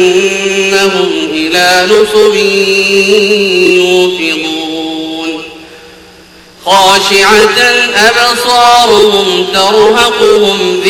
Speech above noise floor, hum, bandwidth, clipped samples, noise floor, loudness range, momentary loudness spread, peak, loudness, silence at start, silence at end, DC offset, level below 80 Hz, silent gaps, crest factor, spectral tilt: 29 dB; none; over 20 kHz; 4%; -36 dBFS; 6 LU; 10 LU; 0 dBFS; -7 LUFS; 0 s; 0 s; 0.2%; -42 dBFS; none; 8 dB; -2.5 dB/octave